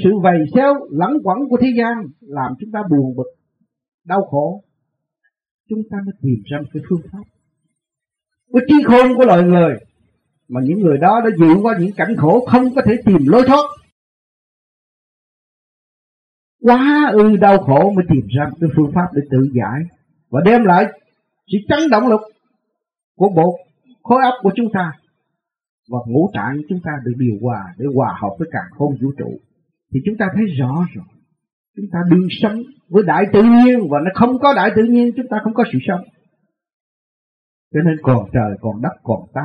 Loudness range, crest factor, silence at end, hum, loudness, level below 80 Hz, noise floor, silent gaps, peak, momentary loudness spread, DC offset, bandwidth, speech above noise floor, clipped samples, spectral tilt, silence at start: 9 LU; 16 dB; 0 s; none; -15 LUFS; -48 dBFS; -84 dBFS; 3.88-3.98 s, 5.51-5.64 s, 13.92-16.59 s, 23.04-23.15 s, 25.69-25.83 s, 31.53-31.74 s, 36.73-37.71 s; 0 dBFS; 14 LU; under 0.1%; 6.4 kHz; 71 dB; under 0.1%; -9 dB/octave; 0 s